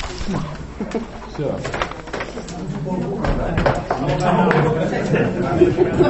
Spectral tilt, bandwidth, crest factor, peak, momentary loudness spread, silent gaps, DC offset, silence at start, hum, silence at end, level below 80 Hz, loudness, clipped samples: -7 dB/octave; 8.4 kHz; 20 dB; 0 dBFS; 12 LU; none; under 0.1%; 0 s; none; 0 s; -32 dBFS; -21 LUFS; under 0.1%